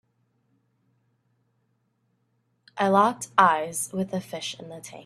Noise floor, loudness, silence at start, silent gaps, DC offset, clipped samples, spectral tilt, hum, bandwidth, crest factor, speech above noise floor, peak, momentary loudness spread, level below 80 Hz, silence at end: -72 dBFS; -24 LUFS; 2.75 s; none; under 0.1%; under 0.1%; -4 dB/octave; none; 14.5 kHz; 26 dB; 47 dB; -2 dBFS; 18 LU; -72 dBFS; 0.05 s